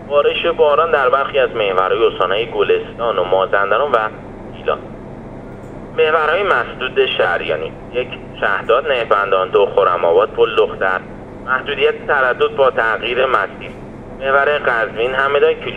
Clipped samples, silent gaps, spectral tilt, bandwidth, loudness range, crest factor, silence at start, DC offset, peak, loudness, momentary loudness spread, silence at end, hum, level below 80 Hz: under 0.1%; none; -6 dB/octave; 7 kHz; 3 LU; 16 dB; 0 s; under 0.1%; 0 dBFS; -16 LUFS; 15 LU; 0 s; none; -42 dBFS